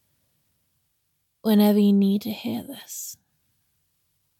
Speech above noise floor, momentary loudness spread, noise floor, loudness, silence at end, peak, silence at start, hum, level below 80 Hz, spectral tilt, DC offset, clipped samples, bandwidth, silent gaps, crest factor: 52 dB; 17 LU; -73 dBFS; -22 LUFS; 1.25 s; -8 dBFS; 1.45 s; none; -74 dBFS; -6.5 dB/octave; under 0.1%; under 0.1%; 17 kHz; none; 16 dB